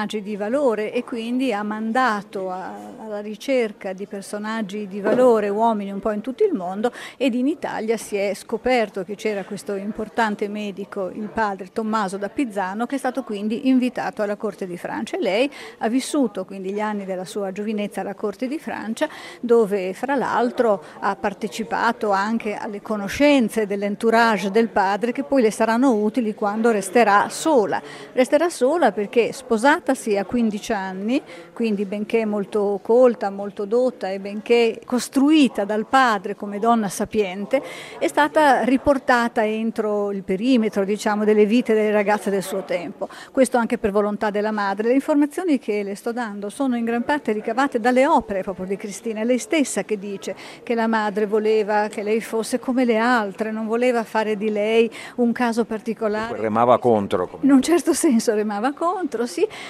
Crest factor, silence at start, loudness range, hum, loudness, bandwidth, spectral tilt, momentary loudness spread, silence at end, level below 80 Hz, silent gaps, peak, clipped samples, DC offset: 20 dB; 0 s; 5 LU; none; -21 LUFS; 15 kHz; -5 dB/octave; 11 LU; 0 s; -58 dBFS; none; -2 dBFS; under 0.1%; under 0.1%